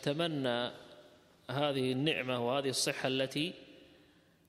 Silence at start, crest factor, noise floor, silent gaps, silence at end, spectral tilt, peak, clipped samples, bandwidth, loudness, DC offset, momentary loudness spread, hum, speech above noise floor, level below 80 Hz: 0 s; 20 dB; -65 dBFS; none; 0.65 s; -4 dB/octave; -16 dBFS; under 0.1%; 14.5 kHz; -34 LUFS; under 0.1%; 9 LU; none; 31 dB; -76 dBFS